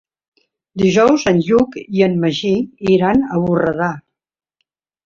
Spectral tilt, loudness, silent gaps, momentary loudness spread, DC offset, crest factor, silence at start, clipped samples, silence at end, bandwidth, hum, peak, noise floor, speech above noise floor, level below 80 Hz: -6.5 dB/octave; -15 LUFS; none; 8 LU; under 0.1%; 14 dB; 0.75 s; under 0.1%; 1.05 s; 7.4 kHz; none; -2 dBFS; -73 dBFS; 58 dB; -48 dBFS